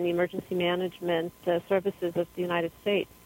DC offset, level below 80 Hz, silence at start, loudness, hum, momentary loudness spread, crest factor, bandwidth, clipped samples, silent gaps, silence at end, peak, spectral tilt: under 0.1%; -64 dBFS; 0 s; -29 LUFS; none; 3 LU; 16 dB; 16.5 kHz; under 0.1%; none; 0.2 s; -12 dBFS; -6.5 dB/octave